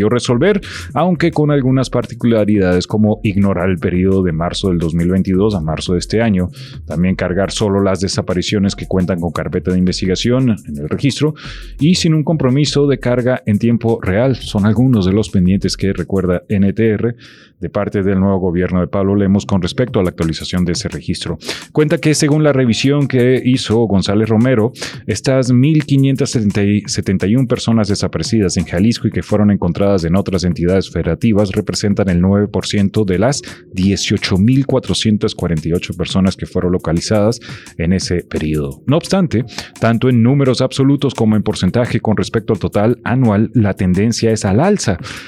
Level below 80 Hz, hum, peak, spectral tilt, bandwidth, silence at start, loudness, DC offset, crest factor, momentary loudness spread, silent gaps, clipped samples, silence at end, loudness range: -38 dBFS; none; -4 dBFS; -6 dB/octave; 13 kHz; 0 s; -15 LUFS; under 0.1%; 10 dB; 6 LU; none; under 0.1%; 0 s; 3 LU